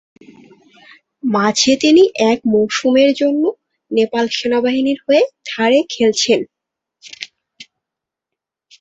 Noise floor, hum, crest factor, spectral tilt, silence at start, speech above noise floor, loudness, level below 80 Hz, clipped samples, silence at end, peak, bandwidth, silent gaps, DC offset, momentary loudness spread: -84 dBFS; none; 16 dB; -3.5 dB/octave; 1.25 s; 70 dB; -15 LUFS; -60 dBFS; under 0.1%; 1.2 s; 0 dBFS; 8.4 kHz; none; under 0.1%; 11 LU